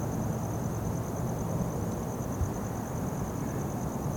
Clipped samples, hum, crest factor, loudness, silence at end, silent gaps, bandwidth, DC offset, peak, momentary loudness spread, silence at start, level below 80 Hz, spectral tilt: under 0.1%; none; 14 dB; -33 LUFS; 0 s; none; 19 kHz; under 0.1%; -18 dBFS; 2 LU; 0 s; -44 dBFS; -7 dB/octave